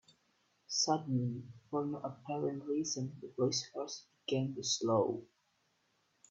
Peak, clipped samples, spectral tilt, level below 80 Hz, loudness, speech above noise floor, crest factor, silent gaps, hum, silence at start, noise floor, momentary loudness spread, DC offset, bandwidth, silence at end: -18 dBFS; under 0.1%; -4.5 dB/octave; -78 dBFS; -36 LUFS; 41 dB; 20 dB; none; none; 0.7 s; -77 dBFS; 11 LU; under 0.1%; 8 kHz; 1.05 s